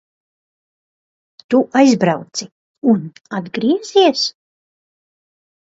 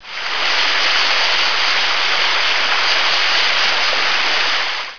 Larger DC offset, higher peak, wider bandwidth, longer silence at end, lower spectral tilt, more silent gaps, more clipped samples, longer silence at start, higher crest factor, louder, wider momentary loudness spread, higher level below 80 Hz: second, under 0.1% vs 7%; about the same, 0 dBFS vs -2 dBFS; first, 7.8 kHz vs 5.4 kHz; first, 1.45 s vs 0 s; first, -5 dB/octave vs 0.5 dB/octave; first, 2.52-2.82 s vs none; neither; first, 1.5 s vs 0 s; about the same, 18 dB vs 14 dB; about the same, -16 LUFS vs -14 LUFS; first, 14 LU vs 3 LU; second, -66 dBFS vs -58 dBFS